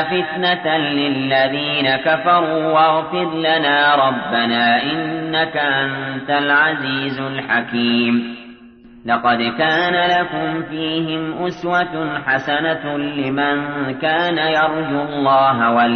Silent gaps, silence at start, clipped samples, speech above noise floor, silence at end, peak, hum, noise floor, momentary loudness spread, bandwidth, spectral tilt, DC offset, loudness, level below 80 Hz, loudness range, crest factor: none; 0 s; under 0.1%; 25 dB; 0 s; -4 dBFS; none; -42 dBFS; 8 LU; 6.4 kHz; -6.5 dB/octave; under 0.1%; -17 LUFS; -56 dBFS; 4 LU; 14 dB